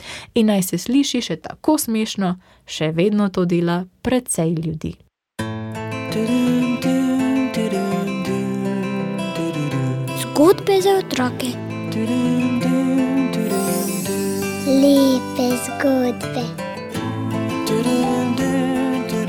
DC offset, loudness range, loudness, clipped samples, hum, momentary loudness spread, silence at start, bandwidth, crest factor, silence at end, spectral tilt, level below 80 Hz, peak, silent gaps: under 0.1%; 3 LU; -20 LUFS; under 0.1%; none; 10 LU; 0 s; 17.5 kHz; 16 dB; 0 s; -5.5 dB/octave; -52 dBFS; -2 dBFS; none